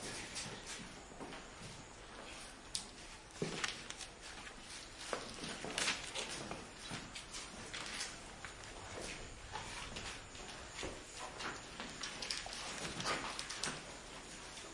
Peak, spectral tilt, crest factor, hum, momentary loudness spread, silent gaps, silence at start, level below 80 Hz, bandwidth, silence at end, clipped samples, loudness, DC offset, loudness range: -16 dBFS; -2 dB/octave; 30 dB; none; 10 LU; none; 0 s; -60 dBFS; 11.5 kHz; 0 s; under 0.1%; -45 LUFS; under 0.1%; 4 LU